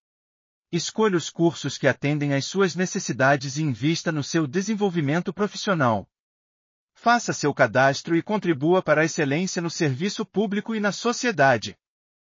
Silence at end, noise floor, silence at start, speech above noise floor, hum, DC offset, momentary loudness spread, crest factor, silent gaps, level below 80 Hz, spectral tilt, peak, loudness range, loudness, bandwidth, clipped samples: 0.55 s; under -90 dBFS; 0.7 s; over 67 dB; none; under 0.1%; 6 LU; 18 dB; 6.20-6.88 s; -70 dBFS; -4.5 dB/octave; -6 dBFS; 3 LU; -23 LUFS; 7.4 kHz; under 0.1%